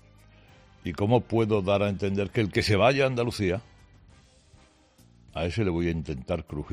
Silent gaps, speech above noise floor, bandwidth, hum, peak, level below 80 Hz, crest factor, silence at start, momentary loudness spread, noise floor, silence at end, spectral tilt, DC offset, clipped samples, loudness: none; 33 dB; 14 kHz; none; -8 dBFS; -50 dBFS; 20 dB; 0.85 s; 11 LU; -58 dBFS; 0 s; -6.5 dB/octave; under 0.1%; under 0.1%; -26 LUFS